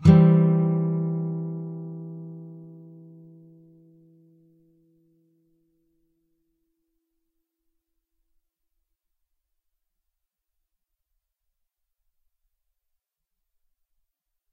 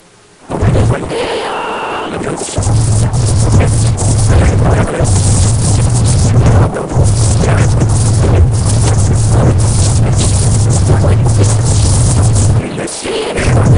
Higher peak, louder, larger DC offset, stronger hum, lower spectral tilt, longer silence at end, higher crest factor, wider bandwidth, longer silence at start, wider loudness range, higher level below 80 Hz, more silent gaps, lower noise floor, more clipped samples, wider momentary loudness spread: second, -4 dBFS vs 0 dBFS; second, -22 LUFS vs -11 LUFS; neither; neither; first, -10.5 dB/octave vs -5.5 dB/octave; first, 11.9 s vs 0 s; first, 26 dB vs 10 dB; second, 4.7 kHz vs 11 kHz; second, 0 s vs 0.5 s; first, 27 LU vs 3 LU; second, -56 dBFS vs -18 dBFS; neither; first, -82 dBFS vs -39 dBFS; neither; first, 27 LU vs 7 LU